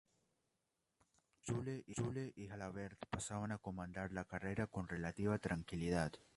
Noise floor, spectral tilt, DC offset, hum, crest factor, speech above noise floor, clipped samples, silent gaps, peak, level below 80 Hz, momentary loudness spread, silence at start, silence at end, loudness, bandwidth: -88 dBFS; -6 dB/octave; under 0.1%; none; 20 dB; 44 dB; under 0.1%; none; -24 dBFS; -62 dBFS; 8 LU; 1.45 s; 0.15 s; -44 LUFS; 11.5 kHz